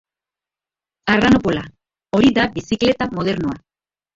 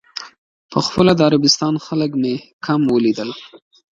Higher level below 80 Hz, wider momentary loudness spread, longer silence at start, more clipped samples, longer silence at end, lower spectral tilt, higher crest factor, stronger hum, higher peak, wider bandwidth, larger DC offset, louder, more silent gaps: first, -44 dBFS vs -50 dBFS; second, 12 LU vs 15 LU; first, 1.05 s vs 0.15 s; neither; first, 0.6 s vs 0.4 s; about the same, -6 dB/octave vs -5 dB/octave; about the same, 18 dB vs 18 dB; neither; about the same, 0 dBFS vs 0 dBFS; second, 7.8 kHz vs 9 kHz; neither; about the same, -18 LUFS vs -17 LUFS; second, none vs 0.38-0.69 s, 2.53-2.59 s